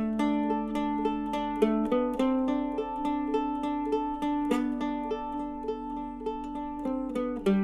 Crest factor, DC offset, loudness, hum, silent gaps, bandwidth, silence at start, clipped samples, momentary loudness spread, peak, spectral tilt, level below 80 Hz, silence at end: 20 dB; under 0.1%; -30 LUFS; none; none; 12.5 kHz; 0 s; under 0.1%; 8 LU; -10 dBFS; -7 dB/octave; -52 dBFS; 0 s